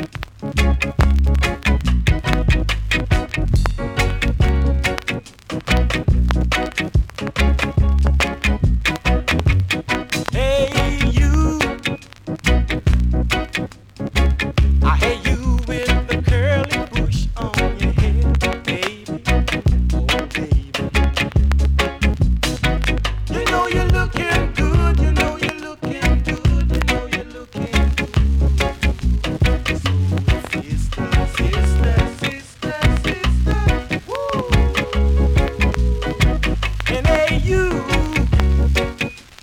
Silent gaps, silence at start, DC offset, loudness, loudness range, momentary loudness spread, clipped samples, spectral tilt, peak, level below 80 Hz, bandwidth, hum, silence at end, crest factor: none; 0 s; under 0.1%; -19 LUFS; 1 LU; 6 LU; under 0.1%; -5.5 dB/octave; -2 dBFS; -20 dBFS; 14.5 kHz; none; 0.2 s; 14 dB